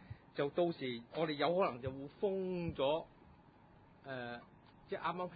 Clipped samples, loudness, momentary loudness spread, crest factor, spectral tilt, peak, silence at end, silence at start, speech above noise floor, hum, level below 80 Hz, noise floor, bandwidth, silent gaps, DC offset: under 0.1%; -39 LUFS; 13 LU; 20 dB; -4.5 dB/octave; -20 dBFS; 0 s; 0 s; 25 dB; none; -66 dBFS; -63 dBFS; 4.8 kHz; none; under 0.1%